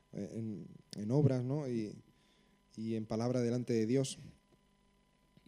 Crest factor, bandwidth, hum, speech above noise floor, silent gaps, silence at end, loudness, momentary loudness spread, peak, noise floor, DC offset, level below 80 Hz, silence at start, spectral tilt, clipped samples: 20 dB; 12 kHz; 50 Hz at -65 dBFS; 36 dB; none; 1.15 s; -36 LUFS; 17 LU; -18 dBFS; -71 dBFS; under 0.1%; -72 dBFS; 0.15 s; -7 dB/octave; under 0.1%